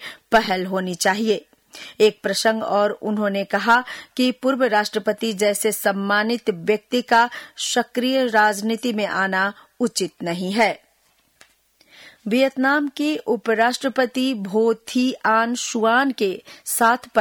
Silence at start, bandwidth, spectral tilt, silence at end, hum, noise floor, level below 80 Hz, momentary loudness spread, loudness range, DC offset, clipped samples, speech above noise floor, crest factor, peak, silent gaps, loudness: 0 s; over 20 kHz; -3.5 dB/octave; 0 s; none; -62 dBFS; -62 dBFS; 7 LU; 3 LU; under 0.1%; under 0.1%; 42 dB; 16 dB; -4 dBFS; none; -20 LUFS